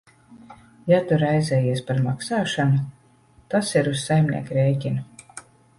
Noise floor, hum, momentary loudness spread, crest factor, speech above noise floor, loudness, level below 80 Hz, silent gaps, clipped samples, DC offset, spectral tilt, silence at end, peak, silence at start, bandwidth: -55 dBFS; none; 15 LU; 16 dB; 35 dB; -22 LUFS; -56 dBFS; none; under 0.1%; under 0.1%; -6.5 dB/octave; 0.4 s; -6 dBFS; 0.3 s; 11.5 kHz